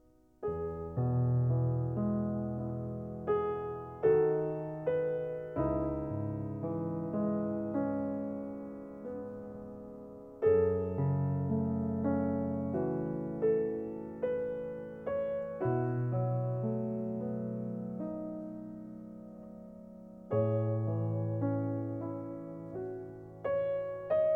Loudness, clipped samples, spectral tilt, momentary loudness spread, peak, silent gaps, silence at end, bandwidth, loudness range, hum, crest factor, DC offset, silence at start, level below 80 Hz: -34 LUFS; under 0.1%; -12 dB/octave; 14 LU; -18 dBFS; none; 0 s; 3.3 kHz; 5 LU; none; 16 dB; under 0.1%; 0.4 s; -58 dBFS